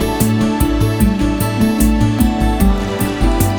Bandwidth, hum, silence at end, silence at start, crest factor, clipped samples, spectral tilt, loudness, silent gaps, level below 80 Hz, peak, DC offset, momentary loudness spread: over 20 kHz; none; 0 s; 0 s; 14 dB; under 0.1%; -6 dB/octave; -15 LUFS; none; -20 dBFS; 0 dBFS; under 0.1%; 3 LU